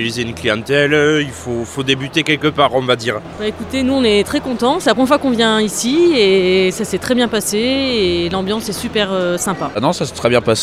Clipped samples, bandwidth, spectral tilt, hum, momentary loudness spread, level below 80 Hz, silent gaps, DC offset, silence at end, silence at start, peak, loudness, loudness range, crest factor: under 0.1%; 15.5 kHz; -4 dB/octave; none; 8 LU; -42 dBFS; none; under 0.1%; 0 s; 0 s; 0 dBFS; -15 LUFS; 3 LU; 16 dB